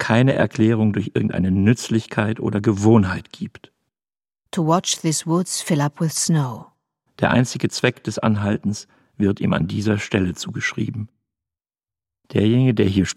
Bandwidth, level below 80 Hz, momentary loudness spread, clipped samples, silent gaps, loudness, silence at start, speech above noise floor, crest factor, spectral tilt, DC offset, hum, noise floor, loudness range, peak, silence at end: 15 kHz; -56 dBFS; 10 LU; under 0.1%; none; -20 LUFS; 0 s; over 71 dB; 18 dB; -5.5 dB/octave; under 0.1%; none; under -90 dBFS; 4 LU; -2 dBFS; 0.05 s